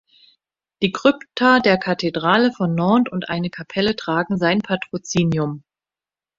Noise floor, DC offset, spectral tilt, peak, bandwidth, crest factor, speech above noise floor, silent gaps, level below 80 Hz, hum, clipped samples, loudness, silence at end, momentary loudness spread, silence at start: under -90 dBFS; under 0.1%; -5.5 dB/octave; 0 dBFS; 7.8 kHz; 20 dB; over 71 dB; none; -56 dBFS; none; under 0.1%; -19 LUFS; 0.8 s; 9 LU; 0.8 s